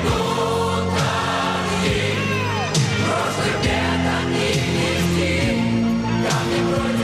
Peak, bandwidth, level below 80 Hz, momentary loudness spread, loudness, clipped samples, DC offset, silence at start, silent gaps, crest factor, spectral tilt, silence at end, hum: -8 dBFS; 15 kHz; -38 dBFS; 1 LU; -20 LUFS; under 0.1%; under 0.1%; 0 s; none; 12 dB; -5 dB/octave; 0 s; none